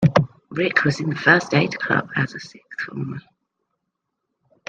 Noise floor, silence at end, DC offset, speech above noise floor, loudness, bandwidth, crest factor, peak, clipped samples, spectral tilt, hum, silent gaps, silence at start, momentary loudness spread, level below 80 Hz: -78 dBFS; 1.5 s; under 0.1%; 57 dB; -20 LUFS; 8.8 kHz; 20 dB; -2 dBFS; under 0.1%; -6 dB/octave; none; none; 0 s; 16 LU; -58 dBFS